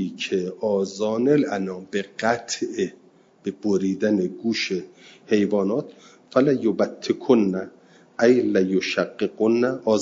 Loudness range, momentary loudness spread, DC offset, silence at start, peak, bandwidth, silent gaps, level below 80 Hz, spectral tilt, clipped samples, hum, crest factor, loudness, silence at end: 4 LU; 10 LU; under 0.1%; 0 s; -4 dBFS; 7.8 kHz; none; -70 dBFS; -5.5 dB/octave; under 0.1%; none; 18 dB; -23 LUFS; 0 s